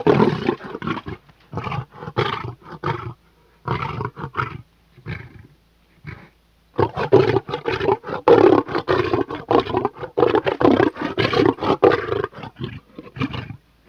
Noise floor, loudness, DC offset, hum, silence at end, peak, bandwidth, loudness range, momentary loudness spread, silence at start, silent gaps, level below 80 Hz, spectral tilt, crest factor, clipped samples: -56 dBFS; -20 LUFS; under 0.1%; none; 0.35 s; -2 dBFS; 6.8 kHz; 12 LU; 19 LU; 0 s; none; -48 dBFS; -7.5 dB/octave; 20 dB; under 0.1%